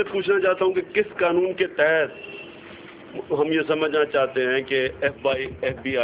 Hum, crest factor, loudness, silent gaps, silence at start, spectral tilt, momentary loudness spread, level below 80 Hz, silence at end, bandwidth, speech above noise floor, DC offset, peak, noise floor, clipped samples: none; 16 dB; -22 LUFS; none; 0 s; -9 dB/octave; 17 LU; -54 dBFS; 0 s; 4 kHz; 20 dB; under 0.1%; -6 dBFS; -42 dBFS; under 0.1%